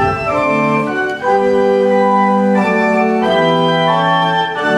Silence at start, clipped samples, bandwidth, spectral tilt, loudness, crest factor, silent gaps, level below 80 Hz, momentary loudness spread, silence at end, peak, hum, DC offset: 0 s; under 0.1%; 11.5 kHz; -6.5 dB/octave; -13 LUFS; 12 dB; none; -46 dBFS; 3 LU; 0 s; -2 dBFS; none; under 0.1%